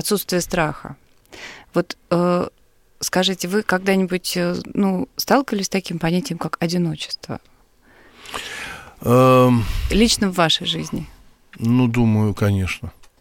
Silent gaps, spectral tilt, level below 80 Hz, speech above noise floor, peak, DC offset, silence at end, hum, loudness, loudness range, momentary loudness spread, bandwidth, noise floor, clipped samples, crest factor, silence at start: none; -5 dB/octave; -38 dBFS; 33 dB; -2 dBFS; under 0.1%; 0.3 s; none; -20 LUFS; 5 LU; 15 LU; 17 kHz; -52 dBFS; under 0.1%; 18 dB; 0 s